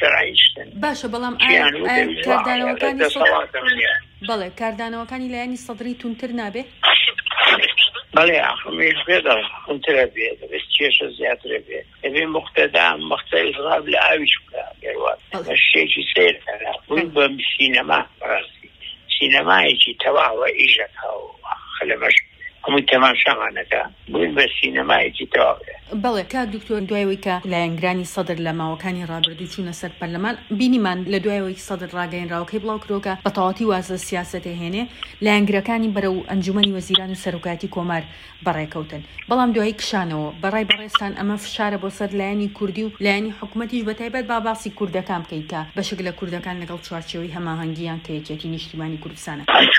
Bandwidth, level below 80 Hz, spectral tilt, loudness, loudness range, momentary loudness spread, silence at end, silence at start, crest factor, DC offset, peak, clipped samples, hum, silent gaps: 16 kHz; -52 dBFS; -4 dB/octave; -19 LUFS; 8 LU; 15 LU; 0 s; 0 s; 20 dB; under 0.1%; 0 dBFS; under 0.1%; none; none